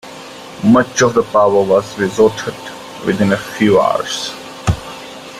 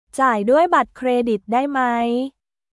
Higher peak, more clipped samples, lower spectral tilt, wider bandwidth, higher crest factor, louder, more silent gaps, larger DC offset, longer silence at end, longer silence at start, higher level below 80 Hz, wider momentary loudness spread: about the same, -2 dBFS vs -4 dBFS; neither; about the same, -5 dB/octave vs -5 dB/octave; first, 15.5 kHz vs 12 kHz; about the same, 14 dB vs 16 dB; first, -15 LUFS vs -19 LUFS; neither; neither; second, 0 s vs 0.45 s; about the same, 0.05 s vs 0.15 s; first, -40 dBFS vs -58 dBFS; first, 18 LU vs 7 LU